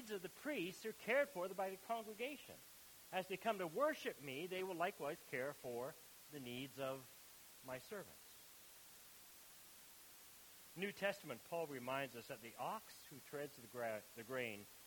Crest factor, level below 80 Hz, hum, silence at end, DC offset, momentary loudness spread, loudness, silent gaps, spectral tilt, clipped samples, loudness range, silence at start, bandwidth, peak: 22 dB; -84 dBFS; none; 0 s; under 0.1%; 17 LU; -46 LUFS; none; -4 dB/octave; under 0.1%; 9 LU; 0 s; 19 kHz; -26 dBFS